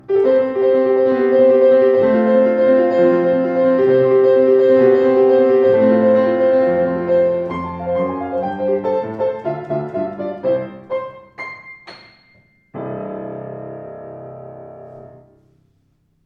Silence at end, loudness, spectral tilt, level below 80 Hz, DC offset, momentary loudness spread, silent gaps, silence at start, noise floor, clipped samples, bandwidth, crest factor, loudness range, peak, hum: 1.2 s; -15 LUFS; -9 dB/octave; -56 dBFS; under 0.1%; 19 LU; none; 0.1 s; -61 dBFS; under 0.1%; 5.2 kHz; 14 dB; 19 LU; -2 dBFS; none